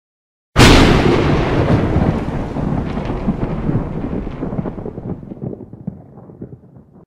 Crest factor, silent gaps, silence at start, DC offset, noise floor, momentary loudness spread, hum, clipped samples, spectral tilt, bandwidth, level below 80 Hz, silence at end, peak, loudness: 16 dB; none; 0.55 s; under 0.1%; -43 dBFS; 21 LU; none; under 0.1%; -5.5 dB/octave; 16 kHz; -24 dBFS; 0.5 s; 0 dBFS; -16 LUFS